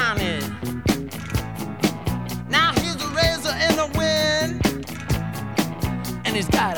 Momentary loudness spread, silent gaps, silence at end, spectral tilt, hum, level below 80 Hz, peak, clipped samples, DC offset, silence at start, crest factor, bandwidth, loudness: 9 LU; none; 0 s; -4.5 dB/octave; none; -36 dBFS; -4 dBFS; under 0.1%; 0.5%; 0 s; 20 dB; over 20 kHz; -23 LUFS